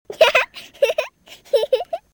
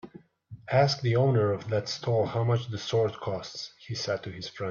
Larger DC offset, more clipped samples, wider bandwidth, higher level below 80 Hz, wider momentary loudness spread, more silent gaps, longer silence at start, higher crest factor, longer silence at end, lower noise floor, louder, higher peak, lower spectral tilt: neither; neither; first, 19.5 kHz vs 7.2 kHz; about the same, -62 dBFS vs -64 dBFS; about the same, 12 LU vs 12 LU; neither; about the same, 0.1 s vs 0.05 s; about the same, 18 dB vs 18 dB; first, 0.15 s vs 0 s; second, -40 dBFS vs -50 dBFS; first, -19 LUFS vs -28 LUFS; first, -2 dBFS vs -10 dBFS; second, -0.5 dB/octave vs -6 dB/octave